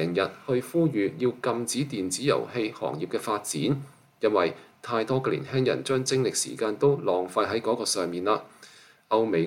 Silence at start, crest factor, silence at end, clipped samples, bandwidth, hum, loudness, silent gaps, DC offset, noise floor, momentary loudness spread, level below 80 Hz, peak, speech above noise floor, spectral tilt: 0 s; 16 dB; 0 s; under 0.1%; 17 kHz; none; -27 LUFS; none; under 0.1%; -53 dBFS; 5 LU; -70 dBFS; -10 dBFS; 26 dB; -4.5 dB/octave